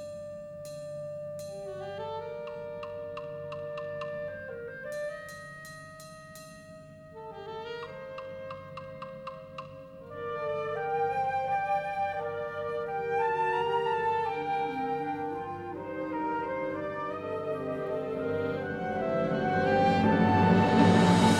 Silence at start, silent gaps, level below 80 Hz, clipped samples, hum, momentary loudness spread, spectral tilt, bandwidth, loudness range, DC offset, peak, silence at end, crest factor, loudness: 0 s; none; -60 dBFS; under 0.1%; none; 19 LU; -6.5 dB/octave; 14 kHz; 14 LU; under 0.1%; -10 dBFS; 0 s; 20 dB; -31 LUFS